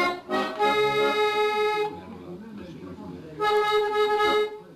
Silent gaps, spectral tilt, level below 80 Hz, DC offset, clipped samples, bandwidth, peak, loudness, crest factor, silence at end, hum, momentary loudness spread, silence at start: none; -4 dB/octave; -60 dBFS; under 0.1%; under 0.1%; 14 kHz; -12 dBFS; -24 LUFS; 12 dB; 0 s; none; 18 LU; 0 s